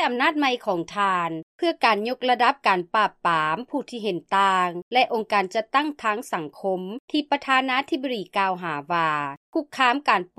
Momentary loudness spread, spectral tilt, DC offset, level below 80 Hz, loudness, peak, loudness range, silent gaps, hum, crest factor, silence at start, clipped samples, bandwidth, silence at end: 8 LU; -4.5 dB/octave; under 0.1%; -72 dBFS; -23 LUFS; -4 dBFS; 3 LU; 1.43-1.59 s, 4.82-4.91 s, 7.00-7.08 s, 9.37-9.53 s; none; 20 dB; 0 s; under 0.1%; 14 kHz; 0.15 s